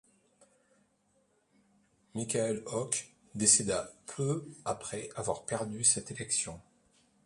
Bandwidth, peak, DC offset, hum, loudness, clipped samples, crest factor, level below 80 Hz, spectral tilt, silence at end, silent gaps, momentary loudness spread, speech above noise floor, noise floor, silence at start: 11.5 kHz; -6 dBFS; under 0.1%; none; -31 LUFS; under 0.1%; 28 dB; -66 dBFS; -3 dB/octave; 0.65 s; none; 15 LU; 40 dB; -73 dBFS; 2.15 s